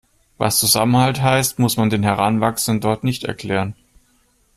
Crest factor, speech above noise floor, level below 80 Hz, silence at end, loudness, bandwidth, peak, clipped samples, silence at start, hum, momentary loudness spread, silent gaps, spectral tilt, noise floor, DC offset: 18 dB; 42 dB; -50 dBFS; 0.85 s; -17 LUFS; 15.5 kHz; 0 dBFS; under 0.1%; 0.4 s; none; 9 LU; none; -4.5 dB/octave; -59 dBFS; under 0.1%